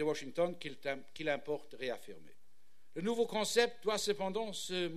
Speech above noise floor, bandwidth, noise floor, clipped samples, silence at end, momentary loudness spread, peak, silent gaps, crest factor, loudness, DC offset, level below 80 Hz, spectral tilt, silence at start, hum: 39 dB; 14 kHz; -75 dBFS; under 0.1%; 0 s; 10 LU; -14 dBFS; none; 22 dB; -37 LUFS; 0.4%; -74 dBFS; -3.5 dB/octave; 0 s; none